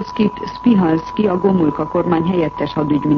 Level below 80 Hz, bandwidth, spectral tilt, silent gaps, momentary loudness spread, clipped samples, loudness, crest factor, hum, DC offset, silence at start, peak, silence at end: -44 dBFS; 6.4 kHz; -9 dB/octave; none; 5 LU; under 0.1%; -17 LUFS; 14 dB; none; under 0.1%; 0 s; -2 dBFS; 0 s